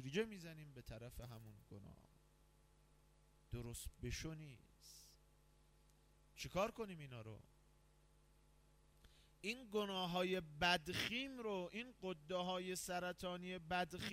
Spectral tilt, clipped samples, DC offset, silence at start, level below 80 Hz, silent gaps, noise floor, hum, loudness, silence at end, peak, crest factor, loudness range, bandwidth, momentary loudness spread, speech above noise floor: -4 dB/octave; under 0.1%; under 0.1%; 0 s; -66 dBFS; none; -72 dBFS; none; -45 LUFS; 0 s; -24 dBFS; 24 dB; 12 LU; 16 kHz; 20 LU; 26 dB